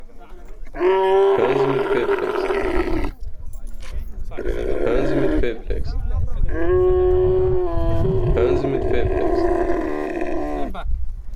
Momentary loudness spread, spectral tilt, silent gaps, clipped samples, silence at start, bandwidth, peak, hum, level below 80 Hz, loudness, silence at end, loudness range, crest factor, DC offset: 16 LU; -8 dB/octave; none; under 0.1%; 0 s; 7.4 kHz; -6 dBFS; none; -26 dBFS; -21 LUFS; 0 s; 5 LU; 12 dB; under 0.1%